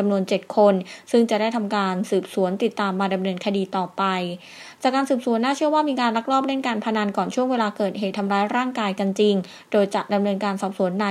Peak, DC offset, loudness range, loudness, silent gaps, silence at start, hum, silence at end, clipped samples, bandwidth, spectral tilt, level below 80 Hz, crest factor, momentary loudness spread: -4 dBFS; under 0.1%; 2 LU; -22 LUFS; none; 0 s; none; 0 s; under 0.1%; 13 kHz; -6 dB/octave; -74 dBFS; 16 dB; 5 LU